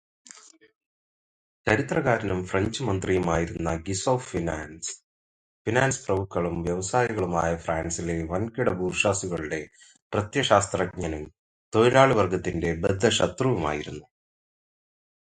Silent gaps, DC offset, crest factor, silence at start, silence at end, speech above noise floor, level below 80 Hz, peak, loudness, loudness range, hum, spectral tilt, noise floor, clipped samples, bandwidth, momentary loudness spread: 5.04-5.65 s, 10.02-10.10 s, 11.39-11.72 s; under 0.1%; 24 dB; 1.65 s; 1.4 s; 26 dB; -46 dBFS; -2 dBFS; -26 LUFS; 4 LU; none; -5 dB/octave; -51 dBFS; under 0.1%; 10.5 kHz; 11 LU